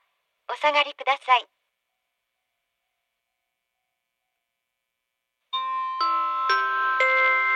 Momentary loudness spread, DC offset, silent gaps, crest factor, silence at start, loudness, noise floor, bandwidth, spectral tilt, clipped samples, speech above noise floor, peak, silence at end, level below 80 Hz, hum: 9 LU; under 0.1%; none; 22 dB; 0.5 s; -23 LUFS; -82 dBFS; 9.4 kHz; 1.5 dB/octave; under 0.1%; 59 dB; -6 dBFS; 0 s; under -90 dBFS; none